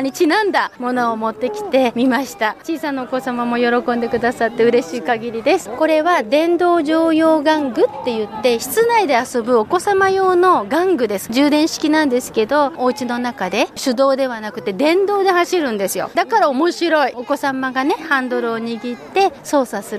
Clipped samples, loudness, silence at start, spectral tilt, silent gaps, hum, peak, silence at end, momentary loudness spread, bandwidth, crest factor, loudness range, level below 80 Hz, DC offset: under 0.1%; -17 LUFS; 0 s; -4 dB/octave; none; none; -2 dBFS; 0 s; 7 LU; 15.5 kHz; 14 dB; 3 LU; -58 dBFS; under 0.1%